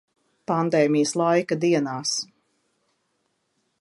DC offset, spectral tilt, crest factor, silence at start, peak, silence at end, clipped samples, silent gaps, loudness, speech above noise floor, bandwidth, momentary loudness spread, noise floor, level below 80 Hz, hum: under 0.1%; -4.5 dB/octave; 18 dB; 0.5 s; -8 dBFS; 1.55 s; under 0.1%; none; -22 LUFS; 51 dB; 11.5 kHz; 8 LU; -73 dBFS; -76 dBFS; none